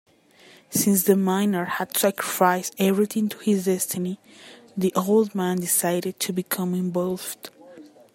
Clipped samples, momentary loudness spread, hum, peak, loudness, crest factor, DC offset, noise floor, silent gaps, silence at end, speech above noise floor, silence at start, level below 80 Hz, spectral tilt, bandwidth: under 0.1%; 9 LU; none; -4 dBFS; -23 LUFS; 20 dB; under 0.1%; -53 dBFS; none; 0.3 s; 30 dB; 0.7 s; -70 dBFS; -4.5 dB/octave; 16.5 kHz